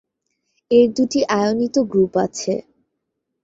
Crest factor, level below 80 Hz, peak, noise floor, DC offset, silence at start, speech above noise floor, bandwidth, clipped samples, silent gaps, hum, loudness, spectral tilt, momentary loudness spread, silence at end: 18 dB; -58 dBFS; -2 dBFS; -77 dBFS; under 0.1%; 0.7 s; 59 dB; 7.8 kHz; under 0.1%; none; none; -18 LUFS; -5 dB/octave; 9 LU; 0.8 s